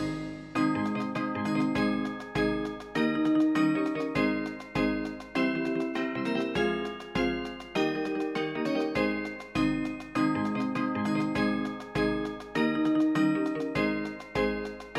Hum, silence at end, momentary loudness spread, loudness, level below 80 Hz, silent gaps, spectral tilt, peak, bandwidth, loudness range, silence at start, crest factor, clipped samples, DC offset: none; 0 s; 8 LU; -29 LUFS; -52 dBFS; none; -6.5 dB/octave; -14 dBFS; 11.5 kHz; 2 LU; 0 s; 14 dB; under 0.1%; under 0.1%